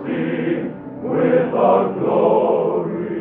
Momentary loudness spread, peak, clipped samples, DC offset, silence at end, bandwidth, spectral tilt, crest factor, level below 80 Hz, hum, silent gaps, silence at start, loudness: 9 LU; -2 dBFS; under 0.1%; under 0.1%; 0 s; 3.9 kHz; -11.5 dB/octave; 14 dB; -58 dBFS; none; none; 0 s; -18 LUFS